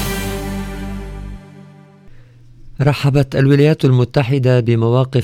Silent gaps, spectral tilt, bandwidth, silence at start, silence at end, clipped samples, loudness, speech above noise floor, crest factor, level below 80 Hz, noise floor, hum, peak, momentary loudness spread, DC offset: none; -7.5 dB/octave; 16.5 kHz; 0 s; 0 s; under 0.1%; -15 LUFS; 28 dB; 14 dB; -34 dBFS; -41 dBFS; none; -2 dBFS; 18 LU; under 0.1%